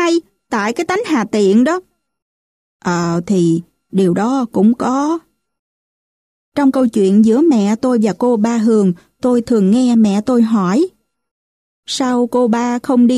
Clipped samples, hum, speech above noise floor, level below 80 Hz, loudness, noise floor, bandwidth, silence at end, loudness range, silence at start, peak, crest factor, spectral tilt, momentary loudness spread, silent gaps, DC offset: under 0.1%; none; over 77 dB; -56 dBFS; -14 LUFS; under -90 dBFS; 11.5 kHz; 0 s; 4 LU; 0 s; -2 dBFS; 12 dB; -6.5 dB/octave; 8 LU; 2.22-2.80 s, 5.59-6.52 s, 11.31-11.83 s; under 0.1%